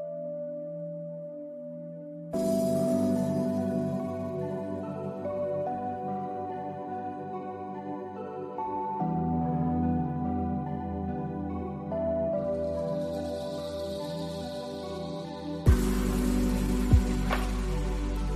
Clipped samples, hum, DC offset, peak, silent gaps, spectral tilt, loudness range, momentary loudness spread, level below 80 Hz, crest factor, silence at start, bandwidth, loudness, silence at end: under 0.1%; none; under 0.1%; -8 dBFS; none; -7.5 dB/octave; 6 LU; 11 LU; -36 dBFS; 22 dB; 0 s; 14 kHz; -31 LUFS; 0 s